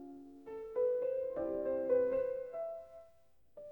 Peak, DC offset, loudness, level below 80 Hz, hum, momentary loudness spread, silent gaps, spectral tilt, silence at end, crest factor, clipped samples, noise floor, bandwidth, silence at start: -22 dBFS; under 0.1%; -36 LUFS; -70 dBFS; none; 20 LU; none; -8.5 dB/octave; 0 s; 16 dB; under 0.1%; -70 dBFS; 18.5 kHz; 0 s